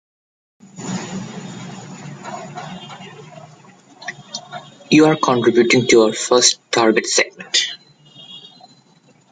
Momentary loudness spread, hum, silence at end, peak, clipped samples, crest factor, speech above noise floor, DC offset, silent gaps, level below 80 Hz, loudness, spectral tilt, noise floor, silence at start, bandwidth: 23 LU; none; 0.95 s; 0 dBFS; under 0.1%; 20 dB; 38 dB; under 0.1%; none; -60 dBFS; -15 LUFS; -3 dB/octave; -53 dBFS; 0.75 s; 9.6 kHz